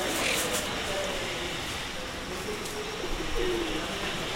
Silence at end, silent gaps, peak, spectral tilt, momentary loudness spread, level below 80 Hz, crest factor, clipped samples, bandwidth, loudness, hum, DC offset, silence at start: 0 s; none; -14 dBFS; -2.5 dB/octave; 8 LU; -42 dBFS; 16 dB; under 0.1%; 16 kHz; -31 LUFS; none; under 0.1%; 0 s